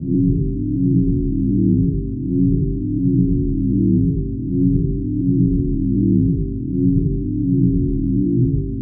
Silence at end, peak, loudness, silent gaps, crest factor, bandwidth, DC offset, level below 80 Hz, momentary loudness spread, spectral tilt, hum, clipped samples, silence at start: 0 s; -4 dBFS; -18 LUFS; none; 12 dB; 0.6 kHz; under 0.1%; -26 dBFS; 5 LU; -23 dB/octave; none; under 0.1%; 0 s